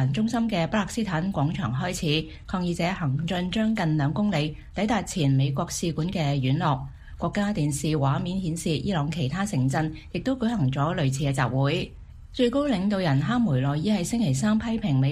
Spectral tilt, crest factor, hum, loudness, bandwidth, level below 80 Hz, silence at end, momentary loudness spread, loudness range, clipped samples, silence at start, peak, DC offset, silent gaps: -6 dB/octave; 16 dB; none; -26 LUFS; 15 kHz; -46 dBFS; 0 s; 5 LU; 2 LU; under 0.1%; 0 s; -8 dBFS; under 0.1%; none